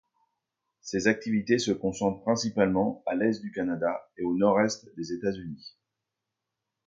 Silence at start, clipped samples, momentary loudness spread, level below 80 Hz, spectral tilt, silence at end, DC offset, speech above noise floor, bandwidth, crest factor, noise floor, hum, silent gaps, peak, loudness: 0.85 s; under 0.1%; 11 LU; -62 dBFS; -5 dB/octave; 1.2 s; under 0.1%; 58 dB; 9 kHz; 22 dB; -86 dBFS; none; none; -8 dBFS; -28 LUFS